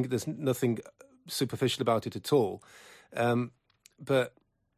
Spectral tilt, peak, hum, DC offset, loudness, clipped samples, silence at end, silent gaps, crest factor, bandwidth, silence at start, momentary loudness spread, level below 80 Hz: -5.5 dB/octave; -14 dBFS; none; under 0.1%; -31 LUFS; under 0.1%; 0.5 s; none; 18 dB; 15.5 kHz; 0 s; 11 LU; -66 dBFS